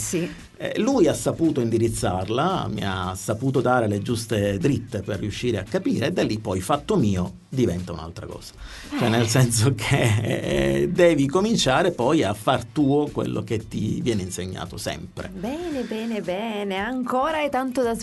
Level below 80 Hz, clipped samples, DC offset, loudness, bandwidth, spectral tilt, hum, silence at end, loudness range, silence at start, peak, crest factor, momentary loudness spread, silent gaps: -46 dBFS; under 0.1%; under 0.1%; -23 LUFS; 12 kHz; -5.5 dB/octave; none; 0 s; 7 LU; 0 s; -4 dBFS; 18 dB; 11 LU; none